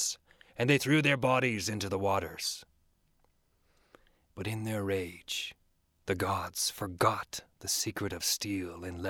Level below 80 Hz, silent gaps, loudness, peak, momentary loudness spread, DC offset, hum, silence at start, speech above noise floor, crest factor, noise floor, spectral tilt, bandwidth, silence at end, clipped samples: -62 dBFS; none; -32 LUFS; -12 dBFS; 14 LU; under 0.1%; none; 0 s; 39 dB; 22 dB; -71 dBFS; -3.5 dB/octave; 19 kHz; 0 s; under 0.1%